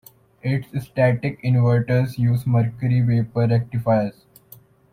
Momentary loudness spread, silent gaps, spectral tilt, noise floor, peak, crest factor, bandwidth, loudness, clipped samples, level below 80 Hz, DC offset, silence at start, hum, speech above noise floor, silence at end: 7 LU; none; -9 dB/octave; -49 dBFS; -6 dBFS; 14 dB; 15.5 kHz; -21 LUFS; under 0.1%; -52 dBFS; under 0.1%; 0.45 s; none; 30 dB; 0.8 s